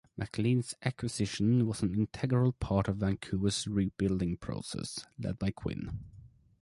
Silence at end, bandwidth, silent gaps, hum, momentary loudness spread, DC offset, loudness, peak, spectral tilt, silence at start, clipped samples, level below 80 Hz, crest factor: 0.35 s; 11.5 kHz; none; none; 10 LU; under 0.1%; -33 LUFS; -14 dBFS; -6 dB/octave; 0.15 s; under 0.1%; -50 dBFS; 20 dB